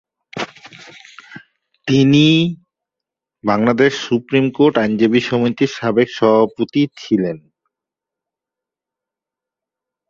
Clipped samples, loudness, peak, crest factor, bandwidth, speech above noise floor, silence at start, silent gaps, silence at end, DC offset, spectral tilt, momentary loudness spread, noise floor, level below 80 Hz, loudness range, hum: under 0.1%; -15 LUFS; -2 dBFS; 16 dB; 7.4 kHz; 72 dB; 0.35 s; none; 2.7 s; under 0.1%; -6.5 dB/octave; 15 LU; -86 dBFS; -58 dBFS; 6 LU; none